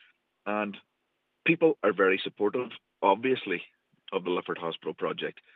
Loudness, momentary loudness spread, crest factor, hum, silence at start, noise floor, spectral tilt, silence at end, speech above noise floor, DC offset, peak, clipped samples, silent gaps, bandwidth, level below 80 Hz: -29 LUFS; 12 LU; 22 dB; none; 0.45 s; -78 dBFS; -8 dB/octave; 0.25 s; 50 dB; under 0.1%; -8 dBFS; under 0.1%; none; 4.5 kHz; -90 dBFS